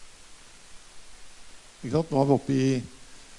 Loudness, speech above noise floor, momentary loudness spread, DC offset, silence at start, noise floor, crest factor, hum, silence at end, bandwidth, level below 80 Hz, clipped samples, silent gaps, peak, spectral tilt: -26 LUFS; 24 dB; 20 LU; under 0.1%; 0 s; -48 dBFS; 22 dB; none; 0 s; 11.5 kHz; -56 dBFS; under 0.1%; none; -8 dBFS; -7 dB/octave